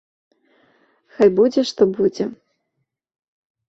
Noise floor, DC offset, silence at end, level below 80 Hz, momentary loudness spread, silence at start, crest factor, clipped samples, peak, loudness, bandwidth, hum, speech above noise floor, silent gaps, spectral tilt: -75 dBFS; under 0.1%; 1.35 s; -62 dBFS; 11 LU; 1.2 s; 18 dB; under 0.1%; -2 dBFS; -18 LUFS; 7.8 kHz; none; 59 dB; none; -6 dB/octave